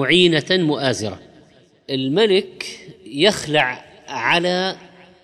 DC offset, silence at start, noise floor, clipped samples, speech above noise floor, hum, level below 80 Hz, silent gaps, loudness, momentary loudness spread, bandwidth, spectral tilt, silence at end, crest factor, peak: under 0.1%; 0 s; -51 dBFS; under 0.1%; 33 dB; none; -58 dBFS; none; -18 LUFS; 16 LU; 13 kHz; -4.5 dB/octave; 0.35 s; 16 dB; -4 dBFS